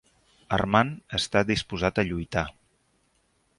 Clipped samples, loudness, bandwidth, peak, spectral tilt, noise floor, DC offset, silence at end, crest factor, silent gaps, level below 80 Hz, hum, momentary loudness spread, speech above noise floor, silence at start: under 0.1%; -26 LUFS; 11.5 kHz; -4 dBFS; -5 dB/octave; -69 dBFS; under 0.1%; 1.05 s; 24 dB; none; -46 dBFS; none; 7 LU; 43 dB; 0.5 s